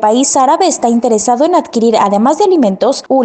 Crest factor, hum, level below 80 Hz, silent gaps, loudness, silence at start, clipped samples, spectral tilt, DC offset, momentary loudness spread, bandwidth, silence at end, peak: 10 dB; none; -56 dBFS; none; -10 LUFS; 0 s; under 0.1%; -4 dB/octave; under 0.1%; 2 LU; 9.2 kHz; 0 s; 0 dBFS